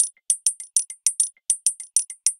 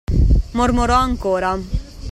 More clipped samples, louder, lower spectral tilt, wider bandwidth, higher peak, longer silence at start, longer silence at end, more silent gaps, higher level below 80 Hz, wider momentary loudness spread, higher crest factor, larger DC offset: neither; second, -21 LUFS vs -18 LUFS; second, 8.5 dB/octave vs -6.5 dB/octave; first, 16 kHz vs 12 kHz; about the same, 0 dBFS vs -2 dBFS; about the same, 0 s vs 0.1 s; about the same, 0.05 s vs 0 s; neither; second, under -90 dBFS vs -20 dBFS; second, 3 LU vs 10 LU; first, 24 dB vs 16 dB; neither